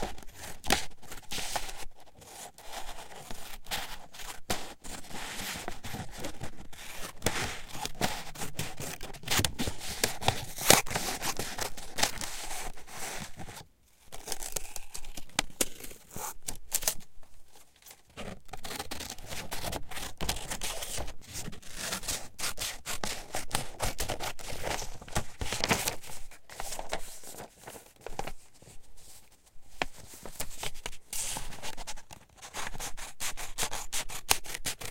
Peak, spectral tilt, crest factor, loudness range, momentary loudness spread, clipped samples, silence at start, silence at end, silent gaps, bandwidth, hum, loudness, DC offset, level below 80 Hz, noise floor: -2 dBFS; -2 dB/octave; 32 dB; 11 LU; 16 LU; under 0.1%; 0 s; 0 s; none; 17 kHz; none; -35 LUFS; under 0.1%; -46 dBFS; -55 dBFS